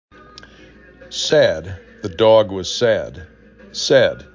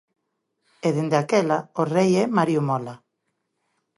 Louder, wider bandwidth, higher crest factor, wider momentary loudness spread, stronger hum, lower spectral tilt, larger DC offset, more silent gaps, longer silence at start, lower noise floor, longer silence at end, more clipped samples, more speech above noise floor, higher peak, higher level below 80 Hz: first, -16 LUFS vs -22 LUFS; second, 7.6 kHz vs 11.5 kHz; about the same, 18 dB vs 18 dB; first, 18 LU vs 8 LU; neither; second, -4 dB/octave vs -6.5 dB/octave; neither; neither; first, 1 s vs 0.85 s; second, -45 dBFS vs -76 dBFS; second, 0.1 s vs 1 s; neither; second, 28 dB vs 55 dB; first, -2 dBFS vs -6 dBFS; first, -46 dBFS vs -70 dBFS